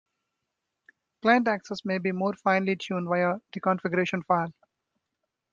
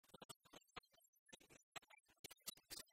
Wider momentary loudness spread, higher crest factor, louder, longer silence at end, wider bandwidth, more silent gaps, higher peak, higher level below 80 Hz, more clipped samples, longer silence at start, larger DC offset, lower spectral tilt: second, 7 LU vs 11 LU; second, 20 dB vs 26 dB; first, -27 LUFS vs -59 LUFS; first, 1 s vs 0 s; second, 7.4 kHz vs 16 kHz; second, none vs 0.25-0.29 s, 0.36-0.40 s, 1.08-1.13 s, 1.19-1.26 s, 1.63-1.72 s, 2.19-2.24 s; first, -8 dBFS vs -36 dBFS; first, -72 dBFS vs -84 dBFS; neither; first, 1.25 s vs 0.05 s; neither; first, -6.5 dB/octave vs -1 dB/octave